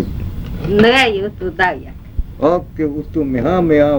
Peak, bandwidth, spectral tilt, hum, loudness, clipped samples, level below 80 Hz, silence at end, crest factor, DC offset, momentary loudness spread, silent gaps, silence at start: 0 dBFS; over 20 kHz; -6.5 dB/octave; none; -15 LUFS; under 0.1%; -30 dBFS; 0 s; 16 dB; under 0.1%; 17 LU; none; 0 s